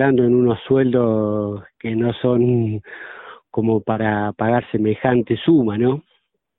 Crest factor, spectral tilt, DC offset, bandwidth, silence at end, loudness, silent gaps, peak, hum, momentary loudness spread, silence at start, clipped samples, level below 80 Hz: 16 dB; -12.5 dB/octave; under 0.1%; 4 kHz; 0.6 s; -19 LUFS; none; -2 dBFS; none; 12 LU; 0 s; under 0.1%; -52 dBFS